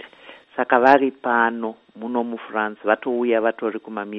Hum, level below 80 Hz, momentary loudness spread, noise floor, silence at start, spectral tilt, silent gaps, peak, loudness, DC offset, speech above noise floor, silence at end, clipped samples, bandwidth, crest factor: none; -68 dBFS; 15 LU; -46 dBFS; 0 s; -6.5 dB/octave; none; 0 dBFS; -21 LUFS; under 0.1%; 25 dB; 0 s; under 0.1%; 7 kHz; 20 dB